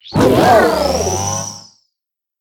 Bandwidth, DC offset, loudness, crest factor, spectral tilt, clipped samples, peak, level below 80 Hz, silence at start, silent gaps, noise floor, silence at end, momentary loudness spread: 17.5 kHz; under 0.1%; -13 LUFS; 14 dB; -4.5 dB/octave; under 0.1%; 0 dBFS; -38 dBFS; 0.05 s; none; -81 dBFS; 0.8 s; 15 LU